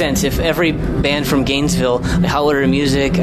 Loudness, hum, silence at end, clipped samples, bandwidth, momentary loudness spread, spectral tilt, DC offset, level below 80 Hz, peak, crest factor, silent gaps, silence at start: -16 LUFS; none; 0 s; under 0.1%; 14 kHz; 2 LU; -5 dB/octave; under 0.1%; -28 dBFS; -4 dBFS; 12 dB; none; 0 s